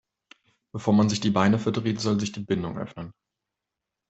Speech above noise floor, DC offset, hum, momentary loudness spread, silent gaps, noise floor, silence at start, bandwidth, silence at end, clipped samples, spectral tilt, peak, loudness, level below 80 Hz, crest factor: 62 dB; under 0.1%; none; 17 LU; none; -86 dBFS; 0.75 s; 8.2 kHz; 1 s; under 0.1%; -6 dB/octave; -6 dBFS; -25 LUFS; -60 dBFS; 20 dB